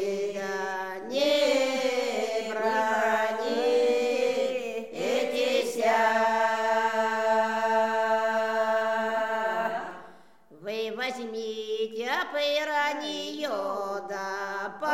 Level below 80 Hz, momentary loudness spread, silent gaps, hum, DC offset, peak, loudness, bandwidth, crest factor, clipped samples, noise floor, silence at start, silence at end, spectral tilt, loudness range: -80 dBFS; 9 LU; none; none; 0.2%; -12 dBFS; -27 LUFS; 16 kHz; 16 dB; under 0.1%; -54 dBFS; 0 s; 0 s; -2.5 dB/octave; 5 LU